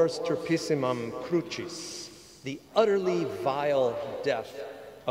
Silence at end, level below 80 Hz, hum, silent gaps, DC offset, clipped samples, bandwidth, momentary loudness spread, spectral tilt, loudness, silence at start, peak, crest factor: 0 s; -68 dBFS; none; none; under 0.1%; under 0.1%; 16 kHz; 15 LU; -5 dB/octave; -29 LUFS; 0 s; -8 dBFS; 20 dB